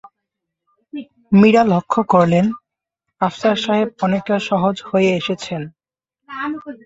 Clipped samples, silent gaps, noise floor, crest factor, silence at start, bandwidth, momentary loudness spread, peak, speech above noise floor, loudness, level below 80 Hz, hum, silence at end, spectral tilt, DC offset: under 0.1%; none; -80 dBFS; 16 dB; 0.95 s; 7.8 kHz; 21 LU; -2 dBFS; 64 dB; -17 LUFS; -56 dBFS; none; 0.1 s; -7 dB/octave; under 0.1%